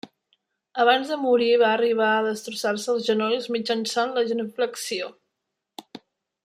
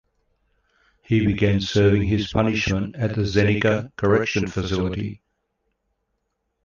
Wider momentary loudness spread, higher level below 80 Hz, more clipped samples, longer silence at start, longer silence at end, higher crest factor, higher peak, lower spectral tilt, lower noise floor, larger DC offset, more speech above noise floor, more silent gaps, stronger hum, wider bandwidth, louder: first, 11 LU vs 6 LU; second, -76 dBFS vs -40 dBFS; neither; second, 0.05 s vs 1.1 s; second, 0.45 s vs 1.5 s; about the same, 20 dB vs 18 dB; about the same, -6 dBFS vs -4 dBFS; second, -3 dB/octave vs -6.5 dB/octave; first, -81 dBFS vs -75 dBFS; neither; first, 59 dB vs 54 dB; neither; neither; first, 15 kHz vs 7.2 kHz; about the same, -23 LUFS vs -21 LUFS